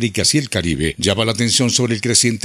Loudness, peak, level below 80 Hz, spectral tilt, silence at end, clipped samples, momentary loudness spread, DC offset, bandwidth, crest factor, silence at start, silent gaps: -16 LUFS; 0 dBFS; -42 dBFS; -3.5 dB/octave; 0.05 s; under 0.1%; 5 LU; under 0.1%; 15.5 kHz; 16 dB; 0 s; none